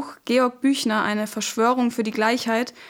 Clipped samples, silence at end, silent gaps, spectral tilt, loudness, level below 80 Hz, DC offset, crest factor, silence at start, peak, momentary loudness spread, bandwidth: under 0.1%; 0 s; none; -3.5 dB/octave; -22 LUFS; -68 dBFS; under 0.1%; 14 dB; 0 s; -8 dBFS; 4 LU; 17.5 kHz